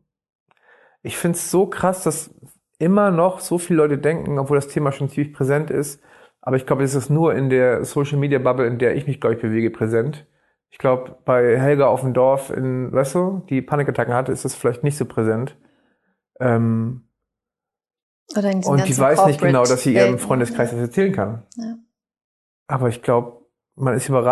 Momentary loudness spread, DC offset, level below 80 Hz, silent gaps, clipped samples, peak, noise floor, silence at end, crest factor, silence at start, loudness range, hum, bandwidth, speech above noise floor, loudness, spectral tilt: 10 LU; under 0.1%; -56 dBFS; 18.03-18.26 s, 22.24-22.66 s; under 0.1%; 0 dBFS; -87 dBFS; 0 s; 20 dB; 1.05 s; 6 LU; none; 12.5 kHz; 69 dB; -19 LUFS; -6.5 dB/octave